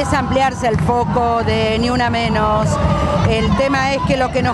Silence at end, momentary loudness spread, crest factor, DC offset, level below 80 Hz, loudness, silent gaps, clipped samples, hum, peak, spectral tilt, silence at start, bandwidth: 0 s; 1 LU; 12 dB; under 0.1%; -28 dBFS; -16 LUFS; none; under 0.1%; none; -2 dBFS; -6 dB/octave; 0 s; 11.5 kHz